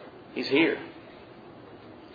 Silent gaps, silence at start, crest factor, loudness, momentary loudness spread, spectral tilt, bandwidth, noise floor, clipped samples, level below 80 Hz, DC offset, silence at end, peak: none; 0 s; 22 dB; -27 LUFS; 24 LU; -6 dB/octave; 5 kHz; -48 dBFS; under 0.1%; -68 dBFS; under 0.1%; 0 s; -10 dBFS